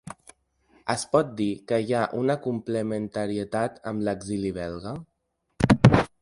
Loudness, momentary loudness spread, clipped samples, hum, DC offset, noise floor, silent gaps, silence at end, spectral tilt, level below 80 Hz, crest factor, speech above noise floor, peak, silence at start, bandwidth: -25 LUFS; 16 LU; under 0.1%; none; under 0.1%; -76 dBFS; none; 0.15 s; -6.5 dB/octave; -46 dBFS; 26 dB; 49 dB; 0 dBFS; 0.05 s; 11.5 kHz